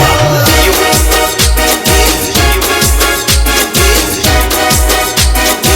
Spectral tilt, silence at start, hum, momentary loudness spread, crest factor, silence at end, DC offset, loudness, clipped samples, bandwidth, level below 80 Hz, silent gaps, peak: -3 dB/octave; 0 s; none; 2 LU; 8 dB; 0 s; under 0.1%; -8 LUFS; 0.3%; over 20 kHz; -14 dBFS; none; 0 dBFS